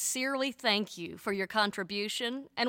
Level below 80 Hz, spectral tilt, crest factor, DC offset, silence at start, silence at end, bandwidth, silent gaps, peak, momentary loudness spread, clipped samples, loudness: -74 dBFS; -2 dB/octave; 20 dB; under 0.1%; 0 s; 0 s; 17 kHz; none; -12 dBFS; 6 LU; under 0.1%; -32 LUFS